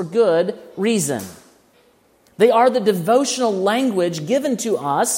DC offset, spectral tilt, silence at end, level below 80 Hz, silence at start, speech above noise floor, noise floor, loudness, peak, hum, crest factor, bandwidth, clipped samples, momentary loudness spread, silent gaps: under 0.1%; -4 dB/octave; 0 s; -68 dBFS; 0 s; 38 dB; -56 dBFS; -18 LUFS; -2 dBFS; none; 16 dB; 16.5 kHz; under 0.1%; 8 LU; none